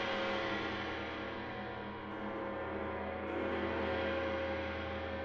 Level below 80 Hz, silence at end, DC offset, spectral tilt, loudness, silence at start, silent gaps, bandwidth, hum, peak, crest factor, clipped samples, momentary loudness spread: -60 dBFS; 0 s; under 0.1%; -6 dB/octave; -39 LUFS; 0 s; none; 7.4 kHz; none; -24 dBFS; 14 dB; under 0.1%; 7 LU